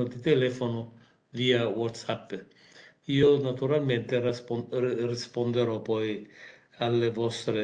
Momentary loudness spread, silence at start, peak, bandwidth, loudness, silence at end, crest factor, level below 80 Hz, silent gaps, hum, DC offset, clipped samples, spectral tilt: 14 LU; 0 s; -10 dBFS; 9.6 kHz; -28 LUFS; 0 s; 18 dB; -66 dBFS; none; none; under 0.1%; under 0.1%; -6.5 dB/octave